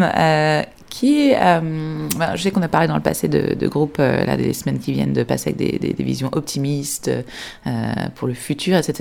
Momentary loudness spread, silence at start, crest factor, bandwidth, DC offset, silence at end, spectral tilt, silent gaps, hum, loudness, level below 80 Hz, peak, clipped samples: 9 LU; 0 s; 18 dB; 19 kHz; under 0.1%; 0 s; -5.5 dB/octave; none; none; -19 LUFS; -48 dBFS; -2 dBFS; under 0.1%